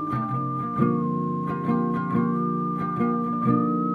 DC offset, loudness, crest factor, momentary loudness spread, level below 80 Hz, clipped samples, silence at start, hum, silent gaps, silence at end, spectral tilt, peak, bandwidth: under 0.1%; -25 LUFS; 16 dB; 4 LU; -58 dBFS; under 0.1%; 0 s; none; none; 0 s; -11 dB/octave; -8 dBFS; 4.6 kHz